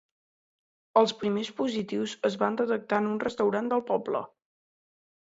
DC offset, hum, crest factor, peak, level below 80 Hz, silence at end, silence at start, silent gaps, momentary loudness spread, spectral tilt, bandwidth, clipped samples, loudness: under 0.1%; none; 22 dB; -8 dBFS; -72 dBFS; 0.95 s; 0.95 s; none; 7 LU; -5.5 dB/octave; 8 kHz; under 0.1%; -28 LUFS